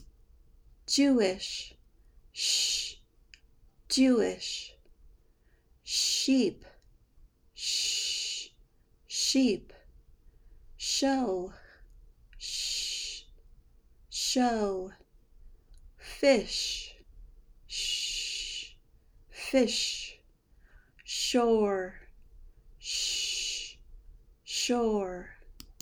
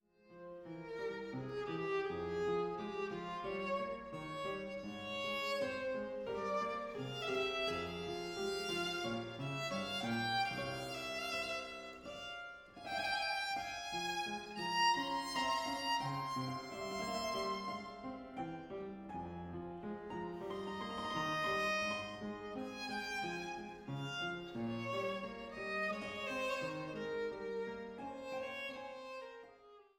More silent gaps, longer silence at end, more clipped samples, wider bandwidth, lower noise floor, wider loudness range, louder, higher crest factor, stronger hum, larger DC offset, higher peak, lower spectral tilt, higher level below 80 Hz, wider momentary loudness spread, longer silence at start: neither; about the same, 0.1 s vs 0.15 s; neither; first, over 20 kHz vs 17.5 kHz; about the same, -65 dBFS vs -62 dBFS; about the same, 3 LU vs 5 LU; first, -29 LUFS vs -40 LUFS; about the same, 20 dB vs 20 dB; neither; neither; first, -12 dBFS vs -22 dBFS; second, -2 dB/octave vs -4 dB/octave; first, -56 dBFS vs -68 dBFS; first, 18 LU vs 10 LU; second, 0 s vs 0.25 s